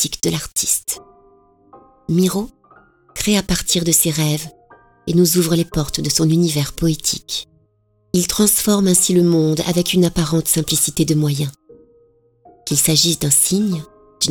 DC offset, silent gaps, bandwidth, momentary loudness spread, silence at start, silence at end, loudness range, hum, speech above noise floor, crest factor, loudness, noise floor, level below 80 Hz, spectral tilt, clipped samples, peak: under 0.1%; none; over 20 kHz; 12 LU; 0 s; 0 s; 4 LU; none; 44 dB; 16 dB; -16 LUFS; -60 dBFS; -40 dBFS; -4 dB/octave; under 0.1%; -2 dBFS